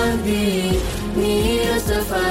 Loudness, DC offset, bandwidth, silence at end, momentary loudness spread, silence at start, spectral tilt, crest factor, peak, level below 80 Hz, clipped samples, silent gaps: -20 LUFS; under 0.1%; 16.5 kHz; 0 s; 3 LU; 0 s; -5 dB/octave; 10 dB; -8 dBFS; -28 dBFS; under 0.1%; none